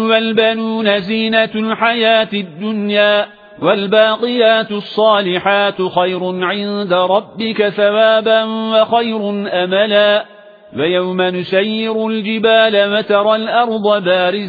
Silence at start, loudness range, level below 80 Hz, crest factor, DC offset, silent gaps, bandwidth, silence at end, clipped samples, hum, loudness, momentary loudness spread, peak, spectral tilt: 0 s; 1 LU; -60 dBFS; 14 dB; under 0.1%; none; 4.9 kHz; 0 s; under 0.1%; none; -14 LUFS; 7 LU; 0 dBFS; -7.5 dB/octave